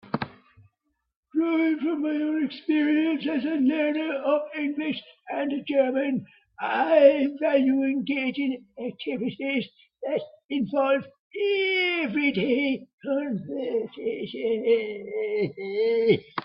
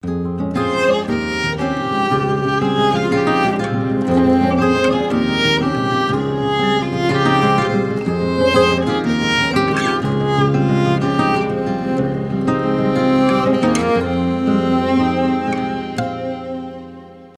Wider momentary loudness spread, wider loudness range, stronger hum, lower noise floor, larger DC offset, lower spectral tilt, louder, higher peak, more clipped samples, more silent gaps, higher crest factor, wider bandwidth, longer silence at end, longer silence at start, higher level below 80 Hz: first, 10 LU vs 6 LU; about the same, 4 LU vs 2 LU; neither; first, -75 dBFS vs -37 dBFS; neither; first, -9.5 dB/octave vs -6 dB/octave; second, -25 LUFS vs -17 LUFS; about the same, -4 dBFS vs -2 dBFS; neither; first, 1.16-1.23 s, 10.45-10.49 s, 11.19-11.30 s, 12.93-12.98 s vs none; first, 22 dB vs 14 dB; second, 5.6 kHz vs 12 kHz; about the same, 0 s vs 0.1 s; about the same, 0.05 s vs 0.05 s; second, -70 dBFS vs -42 dBFS